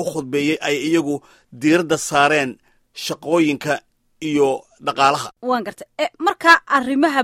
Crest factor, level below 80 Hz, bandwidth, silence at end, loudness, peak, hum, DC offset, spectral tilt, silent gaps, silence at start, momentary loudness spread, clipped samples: 18 dB; -60 dBFS; 16 kHz; 0 s; -18 LUFS; 0 dBFS; none; under 0.1%; -4 dB/octave; none; 0 s; 13 LU; under 0.1%